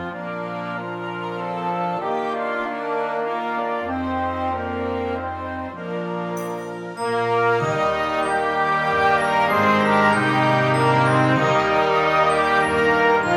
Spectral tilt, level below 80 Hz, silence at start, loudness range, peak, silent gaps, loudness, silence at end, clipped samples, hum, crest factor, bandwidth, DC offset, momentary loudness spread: -6 dB/octave; -50 dBFS; 0 s; 8 LU; -6 dBFS; none; -21 LUFS; 0 s; under 0.1%; none; 16 dB; 16 kHz; under 0.1%; 11 LU